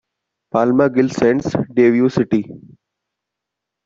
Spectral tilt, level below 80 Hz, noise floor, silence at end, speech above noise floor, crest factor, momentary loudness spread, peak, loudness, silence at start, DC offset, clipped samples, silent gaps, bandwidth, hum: -7.5 dB/octave; -54 dBFS; -82 dBFS; 1.3 s; 66 dB; 16 dB; 7 LU; -2 dBFS; -16 LUFS; 0.55 s; under 0.1%; under 0.1%; none; 7.6 kHz; none